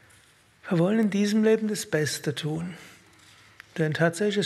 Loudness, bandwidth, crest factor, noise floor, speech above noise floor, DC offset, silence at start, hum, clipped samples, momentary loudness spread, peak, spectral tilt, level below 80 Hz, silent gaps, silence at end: -25 LUFS; 14 kHz; 18 dB; -58 dBFS; 34 dB; under 0.1%; 0.65 s; none; under 0.1%; 15 LU; -8 dBFS; -5.5 dB/octave; -70 dBFS; none; 0 s